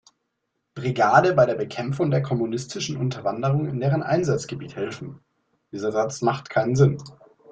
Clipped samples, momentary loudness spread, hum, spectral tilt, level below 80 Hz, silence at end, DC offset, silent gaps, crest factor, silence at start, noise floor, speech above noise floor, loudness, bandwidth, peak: under 0.1%; 14 LU; none; -6.5 dB/octave; -58 dBFS; 0 s; under 0.1%; none; 22 dB; 0.75 s; -77 dBFS; 54 dB; -23 LUFS; 8.6 kHz; -2 dBFS